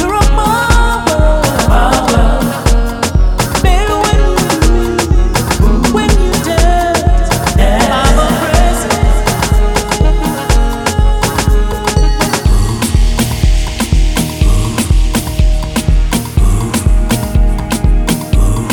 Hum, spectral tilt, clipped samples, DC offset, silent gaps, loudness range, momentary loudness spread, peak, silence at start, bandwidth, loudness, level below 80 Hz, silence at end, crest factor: none; -5 dB/octave; under 0.1%; under 0.1%; none; 2 LU; 4 LU; 0 dBFS; 0 s; 18.5 kHz; -12 LUFS; -12 dBFS; 0 s; 10 dB